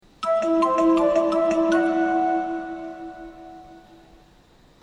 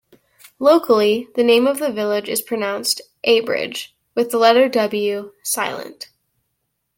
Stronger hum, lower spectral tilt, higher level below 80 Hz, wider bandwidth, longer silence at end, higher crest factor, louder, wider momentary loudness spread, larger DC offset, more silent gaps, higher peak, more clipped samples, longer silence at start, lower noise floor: neither; first, -5.5 dB/octave vs -3 dB/octave; first, -54 dBFS vs -68 dBFS; second, 9.8 kHz vs 17 kHz; about the same, 1.05 s vs 0.95 s; about the same, 14 dB vs 18 dB; second, -21 LUFS vs -18 LUFS; first, 21 LU vs 13 LU; neither; neither; second, -10 dBFS vs -2 dBFS; neither; second, 0.2 s vs 0.6 s; second, -54 dBFS vs -73 dBFS